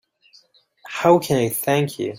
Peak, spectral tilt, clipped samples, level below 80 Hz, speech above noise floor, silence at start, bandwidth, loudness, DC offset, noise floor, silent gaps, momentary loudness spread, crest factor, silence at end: -2 dBFS; -5.5 dB/octave; under 0.1%; -58 dBFS; 37 dB; 0.85 s; 16.5 kHz; -19 LUFS; under 0.1%; -56 dBFS; none; 5 LU; 18 dB; 0 s